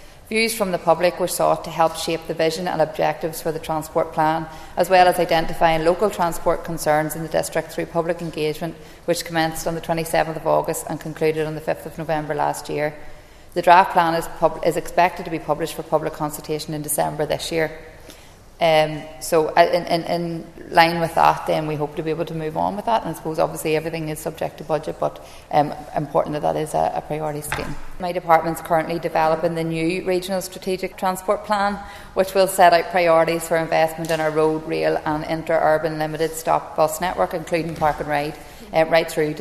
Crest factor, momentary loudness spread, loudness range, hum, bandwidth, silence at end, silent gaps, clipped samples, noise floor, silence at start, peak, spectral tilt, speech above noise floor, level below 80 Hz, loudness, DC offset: 20 dB; 10 LU; 5 LU; none; 14 kHz; 0 s; none; under 0.1%; -43 dBFS; 0 s; 0 dBFS; -4.5 dB/octave; 23 dB; -42 dBFS; -21 LUFS; under 0.1%